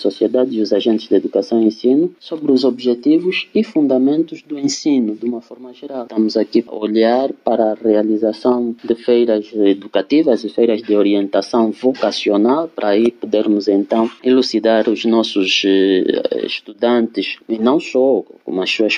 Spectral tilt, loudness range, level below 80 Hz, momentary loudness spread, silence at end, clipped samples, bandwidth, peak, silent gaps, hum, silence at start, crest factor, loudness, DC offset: -5 dB/octave; 3 LU; -68 dBFS; 6 LU; 0 s; under 0.1%; 9.6 kHz; -2 dBFS; none; none; 0 s; 14 dB; -16 LUFS; under 0.1%